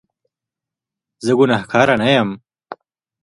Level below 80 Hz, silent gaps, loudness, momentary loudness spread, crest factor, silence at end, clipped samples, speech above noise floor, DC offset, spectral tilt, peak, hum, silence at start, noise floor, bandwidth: -56 dBFS; none; -16 LUFS; 11 LU; 18 dB; 0.5 s; under 0.1%; 71 dB; under 0.1%; -5.5 dB/octave; 0 dBFS; none; 1.2 s; -86 dBFS; 11.5 kHz